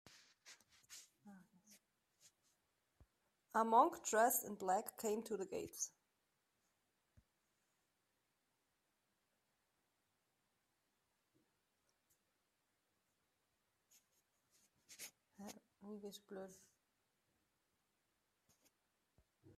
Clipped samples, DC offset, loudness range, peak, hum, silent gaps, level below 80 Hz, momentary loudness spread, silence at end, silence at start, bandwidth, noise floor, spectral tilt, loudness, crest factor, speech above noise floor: under 0.1%; under 0.1%; 23 LU; -20 dBFS; none; none; -88 dBFS; 24 LU; 0.1 s; 0.45 s; 15.5 kHz; -86 dBFS; -3 dB/octave; -39 LUFS; 28 dB; 46 dB